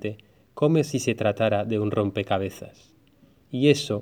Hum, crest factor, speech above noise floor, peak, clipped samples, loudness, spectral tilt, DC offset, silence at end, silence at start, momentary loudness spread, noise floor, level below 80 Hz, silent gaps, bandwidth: none; 20 dB; 34 dB; -6 dBFS; under 0.1%; -24 LUFS; -6 dB/octave; under 0.1%; 0 s; 0 s; 14 LU; -58 dBFS; -64 dBFS; none; 17.5 kHz